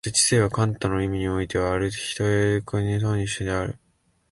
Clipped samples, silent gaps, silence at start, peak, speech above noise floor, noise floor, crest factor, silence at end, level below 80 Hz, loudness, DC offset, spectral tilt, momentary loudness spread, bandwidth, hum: under 0.1%; none; 0.05 s; -6 dBFS; 43 dB; -66 dBFS; 16 dB; 0.55 s; -42 dBFS; -24 LUFS; under 0.1%; -4.5 dB/octave; 8 LU; 11.5 kHz; none